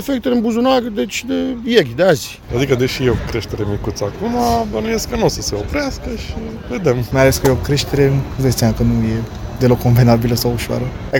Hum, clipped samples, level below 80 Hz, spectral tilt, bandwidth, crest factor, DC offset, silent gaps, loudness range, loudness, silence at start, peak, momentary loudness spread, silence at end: none; under 0.1%; -30 dBFS; -5.5 dB/octave; 17 kHz; 16 dB; under 0.1%; none; 4 LU; -17 LUFS; 0 s; 0 dBFS; 10 LU; 0 s